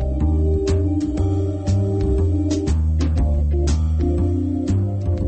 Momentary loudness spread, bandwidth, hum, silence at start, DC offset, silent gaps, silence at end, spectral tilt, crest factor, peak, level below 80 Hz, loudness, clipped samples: 2 LU; 8.6 kHz; none; 0 s; under 0.1%; none; 0 s; -8.5 dB/octave; 10 dB; -8 dBFS; -22 dBFS; -20 LUFS; under 0.1%